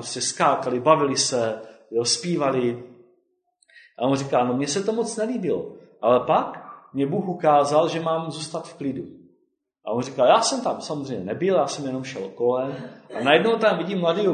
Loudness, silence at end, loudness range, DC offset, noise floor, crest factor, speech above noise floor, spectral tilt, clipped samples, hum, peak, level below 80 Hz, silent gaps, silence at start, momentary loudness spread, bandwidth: -23 LUFS; 0 s; 3 LU; under 0.1%; -69 dBFS; 22 dB; 47 dB; -4 dB/octave; under 0.1%; none; -2 dBFS; -66 dBFS; none; 0 s; 13 LU; 9.6 kHz